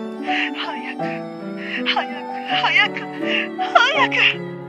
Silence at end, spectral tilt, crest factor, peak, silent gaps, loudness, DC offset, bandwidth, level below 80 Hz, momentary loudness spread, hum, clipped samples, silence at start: 0 s; -4 dB/octave; 20 dB; 0 dBFS; none; -19 LUFS; under 0.1%; 11.5 kHz; -72 dBFS; 12 LU; none; under 0.1%; 0 s